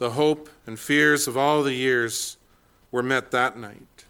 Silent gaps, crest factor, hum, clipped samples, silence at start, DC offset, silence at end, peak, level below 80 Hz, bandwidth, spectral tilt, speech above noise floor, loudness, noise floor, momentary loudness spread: none; 18 dB; none; under 0.1%; 0 s; under 0.1%; 0.35 s; -6 dBFS; -62 dBFS; 18.5 kHz; -3.5 dB/octave; 36 dB; -23 LUFS; -59 dBFS; 16 LU